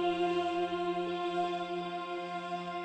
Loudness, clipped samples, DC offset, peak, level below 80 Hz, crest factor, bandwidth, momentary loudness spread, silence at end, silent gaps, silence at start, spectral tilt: -35 LUFS; under 0.1%; under 0.1%; -20 dBFS; -74 dBFS; 14 dB; 9 kHz; 7 LU; 0 s; none; 0 s; -6 dB/octave